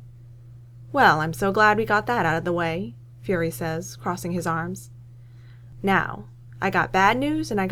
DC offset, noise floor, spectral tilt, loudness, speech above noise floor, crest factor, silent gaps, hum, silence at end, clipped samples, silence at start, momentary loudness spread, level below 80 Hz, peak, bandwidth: under 0.1%; -45 dBFS; -5.5 dB/octave; -23 LUFS; 22 dB; 20 dB; none; none; 0 s; under 0.1%; 0 s; 13 LU; -50 dBFS; -4 dBFS; 19 kHz